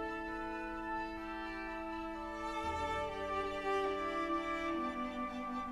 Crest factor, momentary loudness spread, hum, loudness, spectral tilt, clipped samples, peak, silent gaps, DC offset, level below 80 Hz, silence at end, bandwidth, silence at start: 14 dB; 6 LU; none; -39 LUFS; -5 dB/octave; under 0.1%; -24 dBFS; none; under 0.1%; -56 dBFS; 0 s; 13 kHz; 0 s